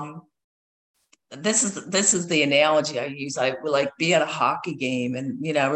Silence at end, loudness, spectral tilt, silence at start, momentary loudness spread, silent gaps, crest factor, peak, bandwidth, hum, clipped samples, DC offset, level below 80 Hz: 0 s; -22 LUFS; -3 dB/octave; 0 s; 10 LU; 0.44-0.94 s; 18 dB; -6 dBFS; 10.5 kHz; none; under 0.1%; under 0.1%; -68 dBFS